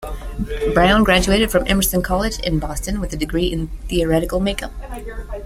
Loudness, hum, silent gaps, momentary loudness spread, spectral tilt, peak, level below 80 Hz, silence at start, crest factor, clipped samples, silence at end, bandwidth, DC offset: -18 LUFS; none; none; 17 LU; -4.5 dB/octave; -2 dBFS; -28 dBFS; 0 s; 18 dB; under 0.1%; 0 s; 16.5 kHz; under 0.1%